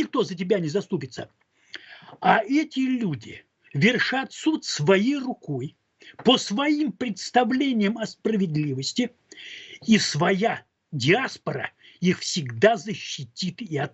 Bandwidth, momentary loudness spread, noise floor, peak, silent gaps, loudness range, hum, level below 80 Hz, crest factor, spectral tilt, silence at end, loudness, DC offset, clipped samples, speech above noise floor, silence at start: 8.4 kHz; 16 LU; -45 dBFS; -2 dBFS; none; 2 LU; none; -68 dBFS; 22 dB; -5 dB/octave; 0.05 s; -24 LUFS; under 0.1%; under 0.1%; 21 dB; 0 s